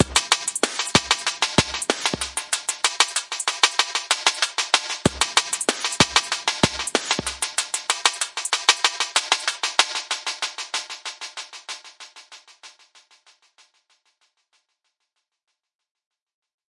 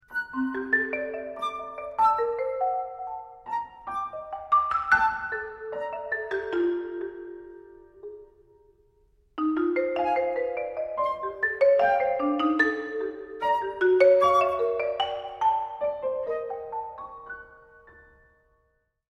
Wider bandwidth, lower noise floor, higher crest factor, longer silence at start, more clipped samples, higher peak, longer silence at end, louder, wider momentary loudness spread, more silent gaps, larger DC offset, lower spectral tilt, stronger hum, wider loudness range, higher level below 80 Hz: about the same, 11.5 kHz vs 11.5 kHz; first, -78 dBFS vs -71 dBFS; about the same, 24 dB vs 20 dB; about the same, 0 s vs 0.1 s; neither; first, 0 dBFS vs -8 dBFS; first, 4 s vs 1.2 s; first, -21 LUFS vs -26 LUFS; about the same, 14 LU vs 16 LU; neither; neither; second, -1 dB/octave vs -5 dB/octave; neither; first, 13 LU vs 10 LU; first, -52 dBFS vs -62 dBFS